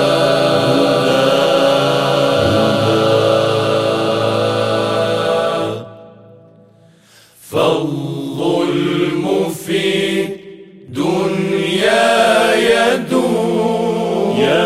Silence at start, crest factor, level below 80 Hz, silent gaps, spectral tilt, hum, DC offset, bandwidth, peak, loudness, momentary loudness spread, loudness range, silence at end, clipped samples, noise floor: 0 s; 14 dB; -52 dBFS; none; -5 dB/octave; none; 0.2%; 15.5 kHz; 0 dBFS; -15 LUFS; 8 LU; 7 LU; 0 s; under 0.1%; -47 dBFS